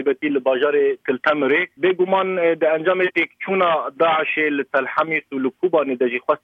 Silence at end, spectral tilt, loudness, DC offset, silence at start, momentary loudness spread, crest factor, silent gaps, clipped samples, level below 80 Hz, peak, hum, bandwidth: 0.05 s; -7 dB/octave; -19 LUFS; under 0.1%; 0 s; 3 LU; 14 dB; none; under 0.1%; -72 dBFS; -4 dBFS; none; 5.2 kHz